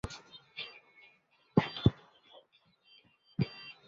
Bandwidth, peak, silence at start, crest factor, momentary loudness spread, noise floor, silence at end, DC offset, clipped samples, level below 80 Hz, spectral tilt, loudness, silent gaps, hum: 7.4 kHz; -10 dBFS; 0.05 s; 28 dB; 18 LU; -69 dBFS; 0.15 s; under 0.1%; under 0.1%; -54 dBFS; -6 dB/octave; -35 LUFS; none; none